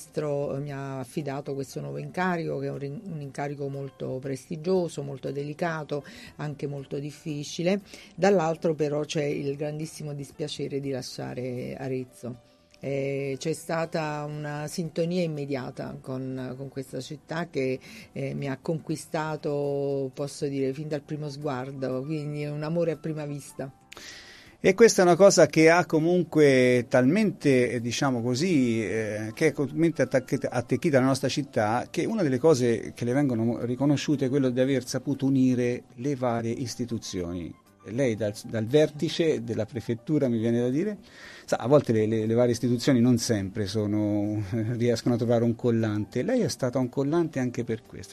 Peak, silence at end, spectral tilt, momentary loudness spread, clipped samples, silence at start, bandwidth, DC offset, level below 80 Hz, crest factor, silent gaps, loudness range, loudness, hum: -4 dBFS; 0 s; -6 dB/octave; 13 LU; under 0.1%; 0 s; 13 kHz; under 0.1%; -62 dBFS; 22 dB; none; 11 LU; -27 LUFS; none